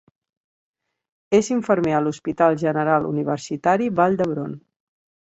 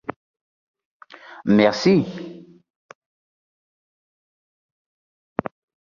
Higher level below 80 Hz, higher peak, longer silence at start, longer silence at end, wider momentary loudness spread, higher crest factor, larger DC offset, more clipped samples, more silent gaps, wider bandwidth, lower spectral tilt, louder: about the same, -60 dBFS vs -62 dBFS; about the same, -4 dBFS vs -4 dBFS; first, 1.3 s vs 0.1 s; second, 0.75 s vs 3.45 s; second, 7 LU vs 21 LU; about the same, 18 dB vs 22 dB; neither; neither; second, none vs 0.16-0.34 s, 0.41-0.74 s, 0.85-1.00 s; first, 8.2 kHz vs 7.2 kHz; about the same, -6.5 dB/octave vs -6.5 dB/octave; about the same, -21 LUFS vs -20 LUFS